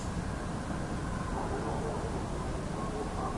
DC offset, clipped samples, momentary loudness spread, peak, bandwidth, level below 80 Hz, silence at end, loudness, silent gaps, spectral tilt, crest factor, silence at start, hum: under 0.1%; under 0.1%; 2 LU; -22 dBFS; 11.5 kHz; -42 dBFS; 0 s; -36 LUFS; none; -6 dB/octave; 14 dB; 0 s; none